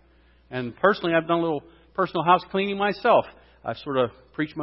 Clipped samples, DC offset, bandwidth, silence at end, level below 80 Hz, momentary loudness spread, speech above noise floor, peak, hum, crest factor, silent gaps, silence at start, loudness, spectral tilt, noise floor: under 0.1%; under 0.1%; 5.8 kHz; 0 s; -58 dBFS; 14 LU; 34 dB; -4 dBFS; none; 20 dB; none; 0.5 s; -24 LUFS; -10 dB/octave; -57 dBFS